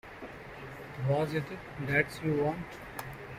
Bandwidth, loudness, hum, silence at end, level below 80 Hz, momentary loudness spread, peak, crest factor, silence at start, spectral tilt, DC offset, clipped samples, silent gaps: 16 kHz; -33 LUFS; none; 0 s; -58 dBFS; 16 LU; -12 dBFS; 22 dB; 0.05 s; -7 dB/octave; under 0.1%; under 0.1%; none